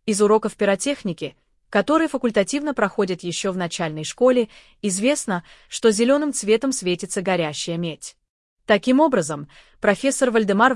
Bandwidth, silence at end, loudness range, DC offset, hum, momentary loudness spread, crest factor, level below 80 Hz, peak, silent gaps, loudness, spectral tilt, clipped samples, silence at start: 12 kHz; 0 s; 2 LU; under 0.1%; none; 11 LU; 18 dB; -58 dBFS; -4 dBFS; 8.29-8.57 s; -21 LUFS; -4 dB/octave; under 0.1%; 0.05 s